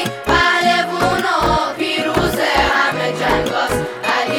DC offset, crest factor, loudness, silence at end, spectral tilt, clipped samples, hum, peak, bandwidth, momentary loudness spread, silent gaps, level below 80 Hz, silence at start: under 0.1%; 16 dB; -16 LUFS; 0 s; -4 dB/octave; under 0.1%; none; 0 dBFS; over 20 kHz; 5 LU; none; -34 dBFS; 0 s